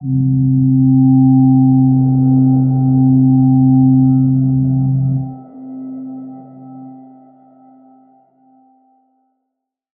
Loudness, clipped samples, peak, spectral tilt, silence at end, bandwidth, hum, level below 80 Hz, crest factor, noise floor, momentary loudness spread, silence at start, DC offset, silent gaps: -12 LUFS; under 0.1%; -2 dBFS; -17.5 dB/octave; 3.05 s; 1.4 kHz; none; -46 dBFS; 12 dB; -76 dBFS; 19 LU; 0 s; under 0.1%; none